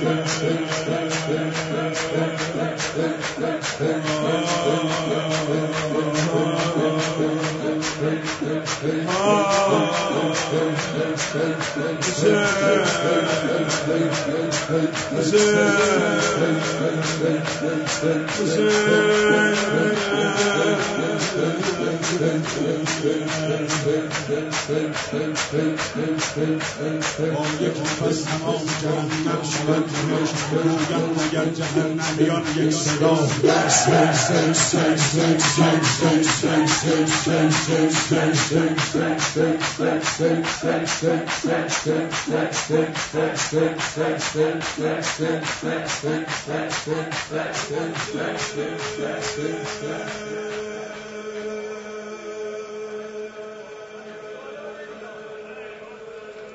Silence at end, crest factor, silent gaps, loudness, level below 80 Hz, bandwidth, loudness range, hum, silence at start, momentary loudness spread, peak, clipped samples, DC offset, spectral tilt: 0 s; 18 dB; none; -21 LUFS; -56 dBFS; 8 kHz; 10 LU; none; 0 s; 13 LU; -2 dBFS; under 0.1%; under 0.1%; -4 dB/octave